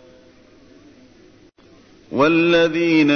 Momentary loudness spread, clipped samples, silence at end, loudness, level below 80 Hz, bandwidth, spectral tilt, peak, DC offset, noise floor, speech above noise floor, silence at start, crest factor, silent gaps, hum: 5 LU; under 0.1%; 0 s; -16 LUFS; -54 dBFS; 6.6 kHz; -6 dB/octave; -4 dBFS; under 0.1%; -49 dBFS; 34 dB; 2.1 s; 16 dB; none; none